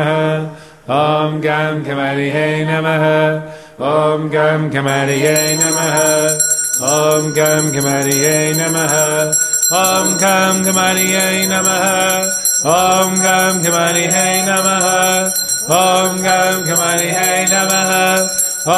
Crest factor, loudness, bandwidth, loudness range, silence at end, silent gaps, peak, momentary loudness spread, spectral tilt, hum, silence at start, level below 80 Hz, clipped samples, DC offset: 14 dB; -13 LUFS; 13.5 kHz; 3 LU; 0 s; none; 0 dBFS; 4 LU; -3 dB/octave; none; 0 s; -56 dBFS; under 0.1%; 0.1%